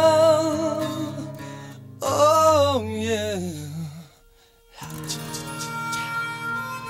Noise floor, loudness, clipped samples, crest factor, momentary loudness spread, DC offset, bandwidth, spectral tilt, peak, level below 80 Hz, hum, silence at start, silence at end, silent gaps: -55 dBFS; -23 LUFS; under 0.1%; 18 dB; 21 LU; under 0.1%; 16 kHz; -4.5 dB/octave; -6 dBFS; -58 dBFS; none; 0 s; 0 s; none